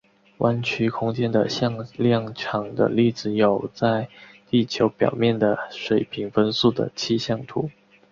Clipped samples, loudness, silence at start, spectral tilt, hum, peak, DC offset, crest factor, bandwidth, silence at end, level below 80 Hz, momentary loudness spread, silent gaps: under 0.1%; -23 LUFS; 0.4 s; -6.5 dB/octave; none; -4 dBFS; under 0.1%; 18 dB; 7.4 kHz; 0.4 s; -58 dBFS; 7 LU; none